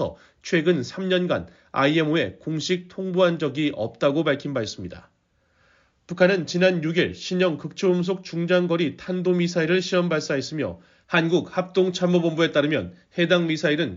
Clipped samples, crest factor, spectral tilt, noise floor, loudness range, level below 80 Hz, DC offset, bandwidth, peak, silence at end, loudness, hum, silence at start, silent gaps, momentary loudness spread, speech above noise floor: under 0.1%; 18 dB; -4.5 dB/octave; -66 dBFS; 3 LU; -60 dBFS; under 0.1%; 7.6 kHz; -6 dBFS; 0 s; -23 LUFS; none; 0 s; none; 8 LU; 43 dB